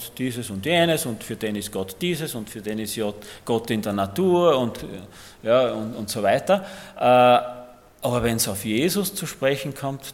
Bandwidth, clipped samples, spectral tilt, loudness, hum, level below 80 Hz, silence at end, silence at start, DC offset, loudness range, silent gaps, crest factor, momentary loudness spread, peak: 17 kHz; under 0.1%; -4.5 dB/octave; -23 LUFS; none; -52 dBFS; 0 s; 0 s; under 0.1%; 5 LU; none; 18 dB; 13 LU; -4 dBFS